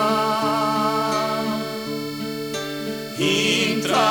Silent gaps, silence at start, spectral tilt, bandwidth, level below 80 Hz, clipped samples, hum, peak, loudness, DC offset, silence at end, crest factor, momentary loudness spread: none; 0 s; -3.5 dB/octave; 19 kHz; -64 dBFS; under 0.1%; none; -6 dBFS; -22 LUFS; 0.1%; 0 s; 16 dB; 10 LU